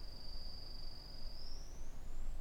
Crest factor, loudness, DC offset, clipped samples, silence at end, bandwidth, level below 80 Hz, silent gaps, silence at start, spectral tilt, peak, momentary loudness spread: 10 dB; -52 LUFS; under 0.1%; under 0.1%; 0 s; 8.2 kHz; -46 dBFS; none; 0 s; -4 dB/octave; -30 dBFS; 3 LU